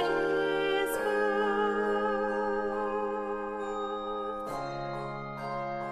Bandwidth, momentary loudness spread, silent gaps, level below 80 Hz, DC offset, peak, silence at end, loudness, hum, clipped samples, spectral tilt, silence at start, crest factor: 15 kHz; 8 LU; none; -60 dBFS; under 0.1%; -18 dBFS; 0 s; -31 LUFS; none; under 0.1%; -5 dB/octave; 0 s; 14 dB